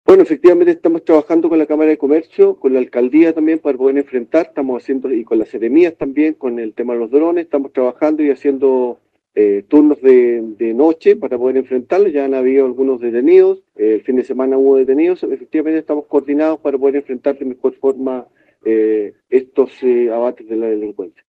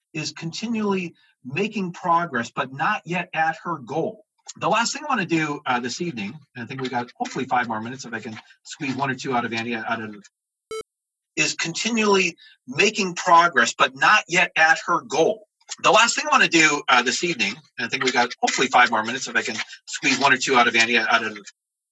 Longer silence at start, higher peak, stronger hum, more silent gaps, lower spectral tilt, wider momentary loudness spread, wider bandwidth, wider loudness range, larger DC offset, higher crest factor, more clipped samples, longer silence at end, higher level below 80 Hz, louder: about the same, 0.1 s vs 0.15 s; first, 0 dBFS vs -4 dBFS; neither; neither; first, -8 dB/octave vs -2.5 dB/octave; second, 9 LU vs 15 LU; second, 5 kHz vs 11 kHz; second, 4 LU vs 9 LU; neither; second, 14 dB vs 20 dB; neither; second, 0.2 s vs 0.4 s; first, -62 dBFS vs -76 dBFS; first, -14 LUFS vs -21 LUFS